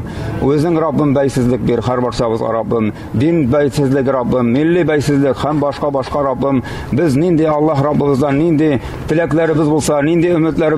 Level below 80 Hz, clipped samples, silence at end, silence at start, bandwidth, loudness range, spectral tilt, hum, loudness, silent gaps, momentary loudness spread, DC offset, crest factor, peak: -36 dBFS; under 0.1%; 0 s; 0 s; 13.5 kHz; 1 LU; -7 dB/octave; none; -14 LUFS; none; 4 LU; under 0.1%; 8 dB; -4 dBFS